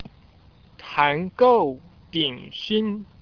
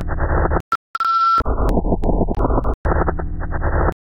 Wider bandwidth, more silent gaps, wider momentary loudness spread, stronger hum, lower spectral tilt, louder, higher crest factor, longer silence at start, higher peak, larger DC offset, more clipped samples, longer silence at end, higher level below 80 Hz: second, 5.4 kHz vs 6.4 kHz; second, none vs 0.60-0.94 s, 2.74-2.84 s; first, 15 LU vs 7 LU; neither; second, -6.5 dB/octave vs -8.5 dB/octave; about the same, -22 LUFS vs -20 LUFS; first, 20 dB vs 12 dB; about the same, 0 s vs 0 s; about the same, -4 dBFS vs -6 dBFS; neither; neither; about the same, 0.2 s vs 0.1 s; second, -58 dBFS vs -22 dBFS